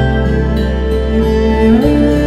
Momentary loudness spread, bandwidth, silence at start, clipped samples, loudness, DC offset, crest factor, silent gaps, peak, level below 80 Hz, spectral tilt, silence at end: 5 LU; 12.5 kHz; 0 s; under 0.1%; -12 LUFS; under 0.1%; 10 dB; none; 0 dBFS; -16 dBFS; -8 dB/octave; 0 s